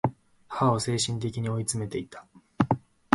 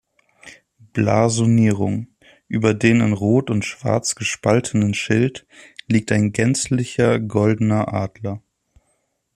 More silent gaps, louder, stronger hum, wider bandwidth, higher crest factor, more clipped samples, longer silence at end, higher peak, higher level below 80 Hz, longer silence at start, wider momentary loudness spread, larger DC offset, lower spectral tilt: neither; second, -29 LUFS vs -19 LUFS; neither; about the same, 11.5 kHz vs 12.5 kHz; first, 28 dB vs 18 dB; neither; second, 0.35 s vs 0.95 s; about the same, 0 dBFS vs -2 dBFS; about the same, -56 dBFS vs -52 dBFS; second, 0.05 s vs 0.45 s; about the same, 12 LU vs 12 LU; neither; about the same, -5 dB/octave vs -6 dB/octave